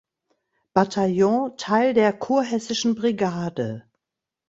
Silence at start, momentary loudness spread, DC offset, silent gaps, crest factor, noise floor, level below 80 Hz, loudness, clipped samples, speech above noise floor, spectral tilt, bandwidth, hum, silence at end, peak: 0.75 s; 8 LU; under 0.1%; none; 20 dB; -86 dBFS; -62 dBFS; -22 LUFS; under 0.1%; 65 dB; -5.5 dB/octave; 8 kHz; none; 0.7 s; -2 dBFS